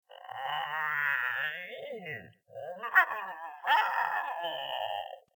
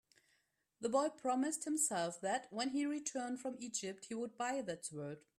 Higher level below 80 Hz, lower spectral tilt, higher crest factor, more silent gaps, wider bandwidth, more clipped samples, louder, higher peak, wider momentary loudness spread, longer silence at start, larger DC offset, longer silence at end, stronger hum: about the same, -88 dBFS vs -84 dBFS; about the same, -2.5 dB/octave vs -3 dB/octave; first, 24 dB vs 18 dB; neither; first, 20 kHz vs 15 kHz; neither; first, -31 LUFS vs -40 LUFS; first, -8 dBFS vs -22 dBFS; first, 16 LU vs 9 LU; second, 0.1 s vs 0.8 s; neither; about the same, 0.15 s vs 0.2 s; neither